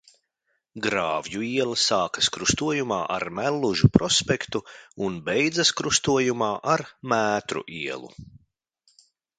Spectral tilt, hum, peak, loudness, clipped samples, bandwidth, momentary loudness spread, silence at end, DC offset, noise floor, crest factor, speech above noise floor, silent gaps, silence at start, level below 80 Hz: -3.5 dB/octave; none; 0 dBFS; -24 LUFS; under 0.1%; 10 kHz; 11 LU; 1 s; under 0.1%; -75 dBFS; 24 dB; 51 dB; none; 0.75 s; -50 dBFS